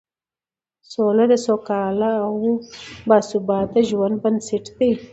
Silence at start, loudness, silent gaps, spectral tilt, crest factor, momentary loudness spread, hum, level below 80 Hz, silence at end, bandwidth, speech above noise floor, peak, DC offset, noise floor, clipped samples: 0.9 s; -20 LUFS; none; -6 dB/octave; 20 dB; 9 LU; none; -56 dBFS; 0.05 s; 8.2 kHz; over 71 dB; 0 dBFS; under 0.1%; under -90 dBFS; under 0.1%